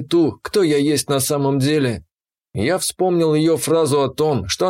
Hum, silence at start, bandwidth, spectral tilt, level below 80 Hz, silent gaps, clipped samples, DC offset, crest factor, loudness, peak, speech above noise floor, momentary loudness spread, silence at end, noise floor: none; 0 s; 16.5 kHz; -5 dB/octave; -50 dBFS; none; under 0.1%; under 0.1%; 12 dB; -18 LUFS; -6 dBFS; 38 dB; 5 LU; 0 s; -55 dBFS